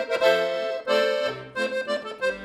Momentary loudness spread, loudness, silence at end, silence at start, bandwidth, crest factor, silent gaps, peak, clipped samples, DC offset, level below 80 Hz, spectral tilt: 8 LU; -25 LUFS; 0 s; 0 s; 16 kHz; 18 dB; none; -6 dBFS; under 0.1%; under 0.1%; -66 dBFS; -3 dB/octave